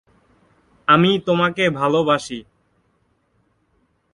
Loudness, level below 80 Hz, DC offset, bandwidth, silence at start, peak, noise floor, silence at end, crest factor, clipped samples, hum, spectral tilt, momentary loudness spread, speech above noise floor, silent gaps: -17 LUFS; -58 dBFS; under 0.1%; 11.5 kHz; 0.9 s; 0 dBFS; -65 dBFS; 1.75 s; 20 dB; under 0.1%; none; -5.5 dB/octave; 13 LU; 47 dB; none